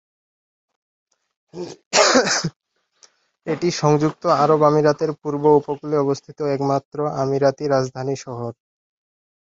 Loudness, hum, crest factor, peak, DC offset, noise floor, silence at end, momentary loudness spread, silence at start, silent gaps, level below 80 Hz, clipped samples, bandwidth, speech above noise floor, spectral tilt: -19 LUFS; none; 20 dB; 0 dBFS; under 0.1%; -56 dBFS; 1.05 s; 15 LU; 1.55 s; 1.86-1.91 s, 2.56-2.60 s, 6.85-6.91 s; -62 dBFS; under 0.1%; 8.2 kHz; 37 dB; -4.5 dB/octave